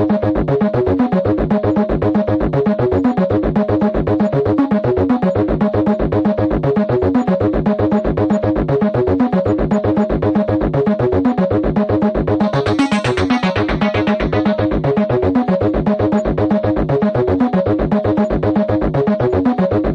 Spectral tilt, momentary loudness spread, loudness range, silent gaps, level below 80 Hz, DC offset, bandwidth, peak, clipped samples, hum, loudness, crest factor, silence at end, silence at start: -8.5 dB/octave; 1 LU; 0 LU; none; -30 dBFS; under 0.1%; 9 kHz; -4 dBFS; under 0.1%; none; -16 LUFS; 12 dB; 0 s; 0 s